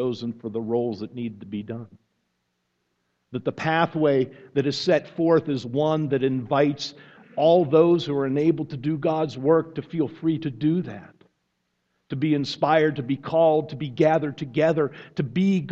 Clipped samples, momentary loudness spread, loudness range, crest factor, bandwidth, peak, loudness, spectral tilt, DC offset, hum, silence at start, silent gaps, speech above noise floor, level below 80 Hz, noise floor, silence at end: under 0.1%; 13 LU; 6 LU; 18 dB; 7.8 kHz; -6 dBFS; -23 LUFS; -7.5 dB/octave; under 0.1%; none; 0 s; none; 52 dB; -64 dBFS; -75 dBFS; 0 s